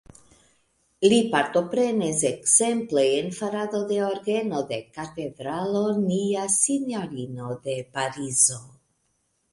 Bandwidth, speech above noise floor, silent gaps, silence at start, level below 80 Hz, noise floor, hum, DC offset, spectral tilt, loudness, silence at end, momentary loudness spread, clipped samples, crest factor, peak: 11.5 kHz; 47 dB; none; 1 s; -64 dBFS; -71 dBFS; none; under 0.1%; -3.5 dB/octave; -24 LUFS; 0.85 s; 14 LU; under 0.1%; 20 dB; -4 dBFS